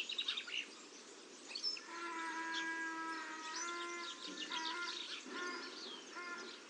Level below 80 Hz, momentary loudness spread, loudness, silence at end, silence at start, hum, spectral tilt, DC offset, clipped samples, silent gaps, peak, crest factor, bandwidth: under -90 dBFS; 8 LU; -43 LUFS; 0 s; 0 s; none; 0.5 dB/octave; under 0.1%; under 0.1%; none; -28 dBFS; 18 dB; 11.5 kHz